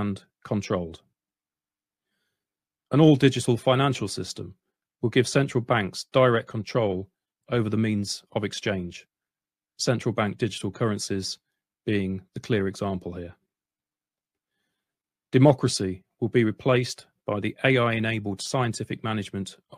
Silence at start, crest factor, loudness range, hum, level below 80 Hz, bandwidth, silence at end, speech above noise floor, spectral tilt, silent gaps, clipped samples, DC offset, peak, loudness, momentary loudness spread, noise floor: 0 s; 22 dB; 7 LU; none; -60 dBFS; 14.5 kHz; 0 s; over 65 dB; -5.5 dB/octave; none; under 0.1%; under 0.1%; -4 dBFS; -25 LUFS; 15 LU; under -90 dBFS